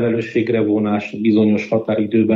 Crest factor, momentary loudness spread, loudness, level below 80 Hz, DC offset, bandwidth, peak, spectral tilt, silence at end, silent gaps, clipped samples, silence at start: 14 dB; 4 LU; -17 LUFS; -60 dBFS; under 0.1%; 7.2 kHz; -4 dBFS; -8.5 dB/octave; 0 s; none; under 0.1%; 0 s